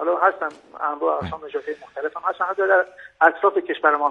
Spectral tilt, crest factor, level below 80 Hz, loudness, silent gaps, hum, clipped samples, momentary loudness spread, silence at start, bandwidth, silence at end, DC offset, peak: -6.5 dB/octave; 20 dB; -60 dBFS; -22 LUFS; none; none; under 0.1%; 12 LU; 0 s; 7.8 kHz; 0 s; under 0.1%; -2 dBFS